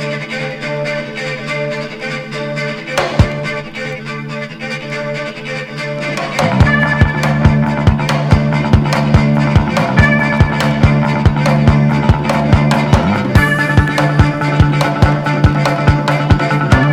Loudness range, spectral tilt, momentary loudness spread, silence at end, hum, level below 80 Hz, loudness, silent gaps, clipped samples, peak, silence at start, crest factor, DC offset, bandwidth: 7 LU; -6.5 dB/octave; 10 LU; 0 s; none; -24 dBFS; -14 LUFS; none; 0.3%; 0 dBFS; 0 s; 12 dB; under 0.1%; 13 kHz